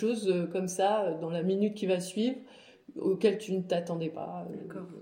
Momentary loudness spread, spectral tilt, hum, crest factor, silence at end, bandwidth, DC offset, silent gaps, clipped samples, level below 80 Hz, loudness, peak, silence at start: 13 LU; -6 dB/octave; none; 18 dB; 0 s; 16 kHz; under 0.1%; none; under 0.1%; -80 dBFS; -31 LUFS; -12 dBFS; 0 s